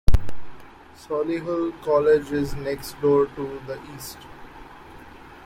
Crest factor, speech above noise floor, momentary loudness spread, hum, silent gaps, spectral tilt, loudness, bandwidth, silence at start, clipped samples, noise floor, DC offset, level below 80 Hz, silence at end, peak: 20 dB; 20 dB; 24 LU; none; none; -6.5 dB/octave; -24 LUFS; 16.5 kHz; 0.1 s; under 0.1%; -44 dBFS; under 0.1%; -32 dBFS; 0.35 s; -2 dBFS